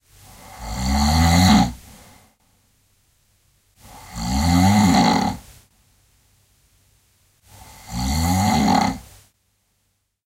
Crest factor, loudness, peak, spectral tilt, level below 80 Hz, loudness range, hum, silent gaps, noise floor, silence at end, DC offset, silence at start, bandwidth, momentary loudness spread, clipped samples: 18 dB; -18 LUFS; -2 dBFS; -5 dB/octave; -32 dBFS; 5 LU; none; none; -70 dBFS; 1.25 s; under 0.1%; 0.5 s; 16 kHz; 21 LU; under 0.1%